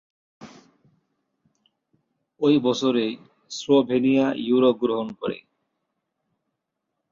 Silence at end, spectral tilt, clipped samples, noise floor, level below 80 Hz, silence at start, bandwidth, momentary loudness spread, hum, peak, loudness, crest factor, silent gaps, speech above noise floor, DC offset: 1.75 s; -5.5 dB/octave; under 0.1%; -80 dBFS; -68 dBFS; 0.4 s; 7.6 kHz; 14 LU; none; -6 dBFS; -22 LUFS; 18 dB; none; 59 dB; under 0.1%